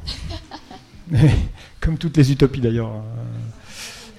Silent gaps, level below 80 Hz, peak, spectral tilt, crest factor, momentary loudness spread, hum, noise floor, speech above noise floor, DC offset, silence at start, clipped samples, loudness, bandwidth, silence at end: none; -30 dBFS; -2 dBFS; -7 dB/octave; 18 dB; 18 LU; none; -41 dBFS; 23 dB; under 0.1%; 0 s; under 0.1%; -20 LUFS; 12.5 kHz; 0.05 s